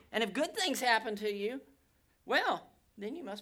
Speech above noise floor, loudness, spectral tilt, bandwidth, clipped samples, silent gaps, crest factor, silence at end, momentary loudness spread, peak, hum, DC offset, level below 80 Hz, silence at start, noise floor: 37 dB; -33 LUFS; -2.5 dB/octave; over 20 kHz; under 0.1%; none; 22 dB; 0 s; 13 LU; -14 dBFS; none; under 0.1%; -74 dBFS; 0.1 s; -71 dBFS